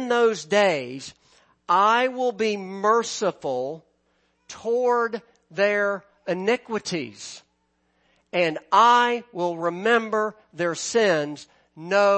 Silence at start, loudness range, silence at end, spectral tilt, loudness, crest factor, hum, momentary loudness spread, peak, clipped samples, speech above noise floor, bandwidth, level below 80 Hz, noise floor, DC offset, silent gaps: 0 s; 5 LU; 0 s; -3.5 dB/octave; -23 LUFS; 18 dB; none; 17 LU; -6 dBFS; under 0.1%; 47 dB; 8.8 kHz; -74 dBFS; -70 dBFS; under 0.1%; none